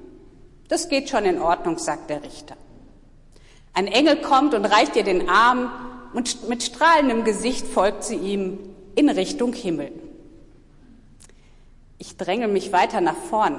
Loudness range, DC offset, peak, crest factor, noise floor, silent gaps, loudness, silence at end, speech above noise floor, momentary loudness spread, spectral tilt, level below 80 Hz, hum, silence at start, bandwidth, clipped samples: 7 LU; under 0.1%; -6 dBFS; 16 dB; -49 dBFS; none; -21 LUFS; 0 s; 28 dB; 15 LU; -3.5 dB/octave; -46 dBFS; none; 0 s; 11.5 kHz; under 0.1%